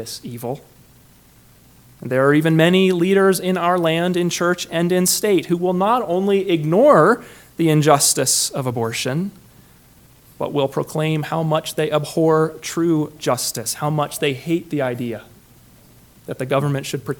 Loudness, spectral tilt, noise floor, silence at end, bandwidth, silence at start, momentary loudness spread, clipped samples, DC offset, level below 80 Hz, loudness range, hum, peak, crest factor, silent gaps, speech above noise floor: -18 LUFS; -4.5 dB/octave; -50 dBFS; 0.05 s; 19 kHz; 0 s; 13 LU; under 0.1%; under 0.1%; -58 dBFS; 7 LU; none; 0 dBFS; 18 dB; none; 32 dB